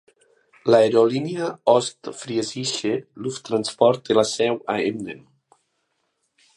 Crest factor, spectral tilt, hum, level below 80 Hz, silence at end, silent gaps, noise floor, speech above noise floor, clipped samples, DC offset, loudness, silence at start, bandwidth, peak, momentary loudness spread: 20 dB; -4.5 dB/octave; none; -68 dBFS; 1.4 s; none; -72 dBFS; 52 dB; under 0.1%; under 0.1%; -21 LUFS; 0.65 s; 11.5 kHz; -2 dBFS; 14 LU